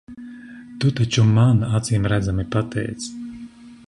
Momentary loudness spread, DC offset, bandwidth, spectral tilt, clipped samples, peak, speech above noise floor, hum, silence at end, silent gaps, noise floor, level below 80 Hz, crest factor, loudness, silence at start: 23 LU; under 0.1%; 11 kHz; -6 dB/octave; under 0.1%; -6 dBFS; 22 dB; none; 0.1 s; none; -40 dBFS; -42 dBFS; 14 dB; -20 LUFS; 0.1 s